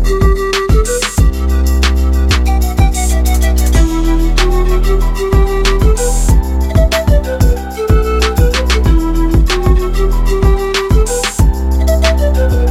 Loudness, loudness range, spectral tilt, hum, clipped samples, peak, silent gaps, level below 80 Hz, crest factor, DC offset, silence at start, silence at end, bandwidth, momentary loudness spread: -13 LUFS; 0 LU; -5.5 dB/octave; none; under 0.1%; 0 dBFS; none; -12 dBFS; 10 dB; under 0.1%; 0 s; 0 s; 15.5 kHz; 2 LU